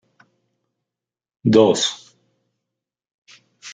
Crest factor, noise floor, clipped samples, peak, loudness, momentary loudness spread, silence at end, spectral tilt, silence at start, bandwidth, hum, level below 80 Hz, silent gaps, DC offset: 22 dB; -88 dBFS; under 0.1%; -2 dBFS; -17 LUFS; 24 LU; 0 s; -5 dB/octave; 1.45 s; 9.4 kHz; none; -64 dBFS; 3.14-3.26 s; under 0.1%